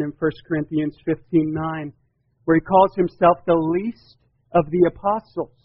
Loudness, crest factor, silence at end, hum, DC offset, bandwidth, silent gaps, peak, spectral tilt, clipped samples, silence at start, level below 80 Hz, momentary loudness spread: -21 LUFS; 18 dB; 0.2 s; none; under 0.1%; 5.6 kHz; none; -2 dBFS; -7 dB/octave; under 0.1%; 0 s; -50 dBFS; 12 LU